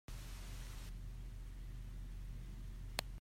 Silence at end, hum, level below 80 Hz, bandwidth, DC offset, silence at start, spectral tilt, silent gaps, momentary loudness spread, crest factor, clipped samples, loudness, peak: 0 s; none; -48 dBFS; 16 kHz; under 0.1%; 0.1 s; -4 dB/octave; none; 7 LU; 30 dB; under 0.1%; -51 LUFS; -18 dBFS